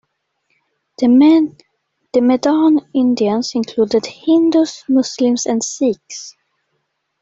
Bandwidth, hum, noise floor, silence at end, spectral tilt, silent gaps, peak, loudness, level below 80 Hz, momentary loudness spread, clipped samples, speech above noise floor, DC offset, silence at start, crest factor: 8 kHz; none; -70 dBFS; 0.9 s; -4.5 dB/octave; none; -2 dBFS; -15 LUFS; -60 dBFS; 9 LU; under 0.1%; 56 dB; under 0.1%; 1 s; 14 dB